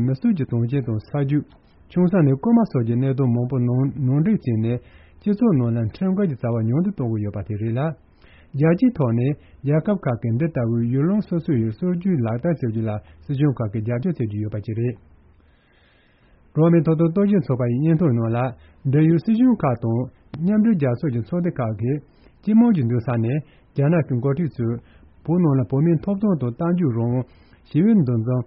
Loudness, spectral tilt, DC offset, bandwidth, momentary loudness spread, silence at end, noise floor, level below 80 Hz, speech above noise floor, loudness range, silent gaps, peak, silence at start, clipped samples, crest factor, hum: -21 LUFS; -10 dB/octave; under 0.1%; 5.4 kHz; 10 LU; 0 s; -56 dBFS; -52 dBFS; 37 dB; 4 LU; none; -6 dBFS; 0 s; under 0.1%; 14 dB; none